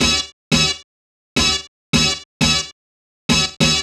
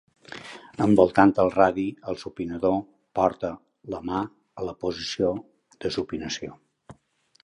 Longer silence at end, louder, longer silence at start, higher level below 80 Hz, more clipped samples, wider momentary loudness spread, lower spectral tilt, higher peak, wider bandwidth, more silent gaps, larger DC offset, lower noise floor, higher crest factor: second, 0 s vs 0.5 s; first, -17 LUFS vs -25 LUFS; second, 0 s vs 0.3 s; first, -36 dBFS vs -54 dBFS; neither; second, 8 LU vs 20 LU; second, -2.5 dB/octave vs -6 dB/octave; about the same, -2 dBFS vs -2 dBFS; first, 14.5 kHz vs 10.5 kHz; first, 0.33-0.51 s, 0.84-1.36 s, 1.68-1.93 s, 2.25-2.40 s, 2.72-3.29 s vs none; neither; first, under -90 dBFS vs -64 dBFS; second, 18 dB vs 24 dB